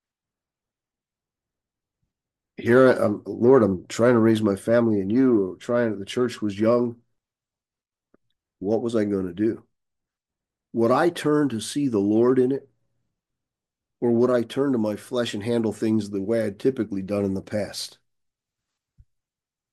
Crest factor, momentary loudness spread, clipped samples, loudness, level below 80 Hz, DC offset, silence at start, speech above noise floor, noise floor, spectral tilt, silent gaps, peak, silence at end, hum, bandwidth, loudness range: 20 dB; 10 LU; under 0.1%; -22 LUFS; -68 dBFS; under 0.1%; 2.6 s; over 68 dB; under -90 dBFS; -6.5 dB/octave; none; -4 dBFS; 1.85 s; none; 12.5 kHz; 8 LU